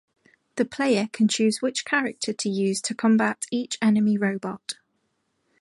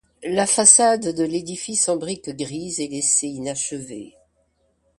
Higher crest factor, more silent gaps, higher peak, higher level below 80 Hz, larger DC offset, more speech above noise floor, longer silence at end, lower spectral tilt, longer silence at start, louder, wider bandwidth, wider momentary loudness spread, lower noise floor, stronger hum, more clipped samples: second, 16 dB vs 22 dB; neither; second, -8 dBFS vs 0 dBFS; second, -72 dBFS vs -62 dBFS; neither; first, 50 dB vs 45 dB; about the same, 0.85 s vs 0.9 s; first, -4.5 dB/octave vs -2.5 dB/octave; first, 0.55 s vs 0.2 s; second, -24 LUFS vs -19 LUFS; about the same, 11.5 kHz vs 11.5 kHz; second, 11 LU vs 18 LU; first, -73 dBFS vs -66 dBFS; neither; neither